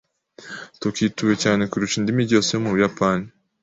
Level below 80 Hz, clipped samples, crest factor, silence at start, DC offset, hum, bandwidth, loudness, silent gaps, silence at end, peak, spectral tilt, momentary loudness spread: -54 dBFS; under 0.1%; 18 dB; 0.4 s; under 0.1%; none; 8 kHz; -21 LUFS; none; 0.35 s; -4 dBFS; -5 dB/octave; 17 LU